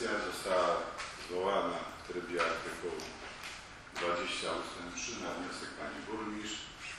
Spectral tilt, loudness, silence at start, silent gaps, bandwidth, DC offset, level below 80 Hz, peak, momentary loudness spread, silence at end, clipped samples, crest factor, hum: -3 dB/octave; -37 LUFS; 0 s; none; 13 kHz; under 0.1%; -62 dBFS; -18 dBFS; 10 LU; 0 s; under 0.1%; 18 dB; none